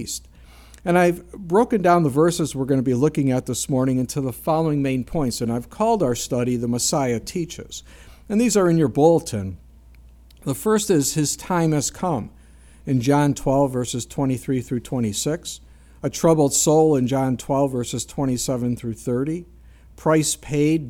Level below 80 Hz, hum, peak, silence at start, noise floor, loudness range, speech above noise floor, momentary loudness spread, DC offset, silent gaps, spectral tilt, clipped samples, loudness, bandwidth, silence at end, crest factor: -46 dBFS; none; -4 dBFS; 0 s; -47 dBFS; 3 LU; 26 dB; 12 LU; under 0.1%; none; -5.5 dB/octave; under 0.1%; -21 LUFS; 17.5 kHz; 0 s; 18 dB